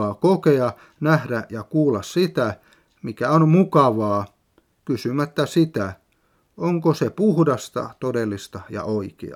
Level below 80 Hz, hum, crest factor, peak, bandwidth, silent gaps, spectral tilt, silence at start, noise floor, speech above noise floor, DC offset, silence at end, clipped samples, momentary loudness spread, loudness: -62 dBFS; none; 20 dB; -2 dBFS; 15 kHz; none; -7.5 dB/octave; 0 s; -64 dBFS; 44 dB; under 0.1%; 0 s; under 0.1%; 13 LU; -21 LUFS